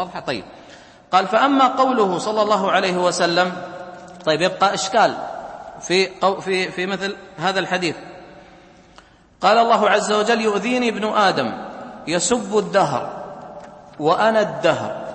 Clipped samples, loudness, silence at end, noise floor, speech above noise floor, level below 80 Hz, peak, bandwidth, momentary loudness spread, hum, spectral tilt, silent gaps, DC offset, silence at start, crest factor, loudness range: under 0.1%; -19 LUFS; 0 s; -49 dBFS; 30 dB; -60 dBFS; -2 dBFS; 8.8 kHz; 17 LU; none; -3.5 dB/octave; none; under 0.1%; 0 s; 18 dB; 4 LU